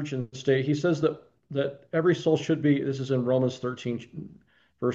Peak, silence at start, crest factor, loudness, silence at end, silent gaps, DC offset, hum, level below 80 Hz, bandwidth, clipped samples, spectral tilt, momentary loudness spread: -10 dBFS; 0 s; 16 dB; -27 LUFS; 0 s; none; under 0.1%; none; -70 dBFS; 7.8 kHz; under 0.1%; -7 dB/octave; 11 LU